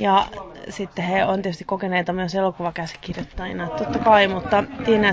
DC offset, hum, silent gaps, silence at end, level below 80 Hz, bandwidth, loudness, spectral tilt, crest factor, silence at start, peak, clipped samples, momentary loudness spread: under 0.1%; none; none; 0 s; -46 dBFS; 8 kHz; -22 LUFS; -6 dB/octave; 18 dB; 0 s; -2 dBFS; under 0.1%; 15 LU